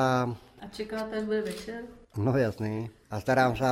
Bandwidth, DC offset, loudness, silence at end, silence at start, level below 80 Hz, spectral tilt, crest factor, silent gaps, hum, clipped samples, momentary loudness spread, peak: 16 kHz; under 0.1%; -30 LUFS; 0 s; 0 s; -56 dBFS; -6.5 dB/octave; 20 dB; none; none; under 0.1%; 15 LU; -10 dBFS